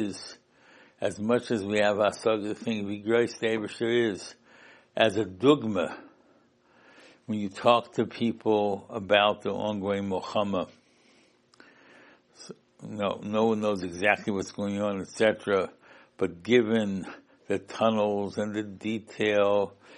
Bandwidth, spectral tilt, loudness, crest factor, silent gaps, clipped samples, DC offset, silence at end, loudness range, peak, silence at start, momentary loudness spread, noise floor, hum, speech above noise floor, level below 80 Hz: 11.5 kHz; -5.5 dB/octave; -27 LUFS; 22 dB; none; under 0.1%; under 0.1%; 0 s; 6 LU; -6 dBFS; 0 s; 11 LU; -63 dBFS; none; 36 dB; -72 dBFS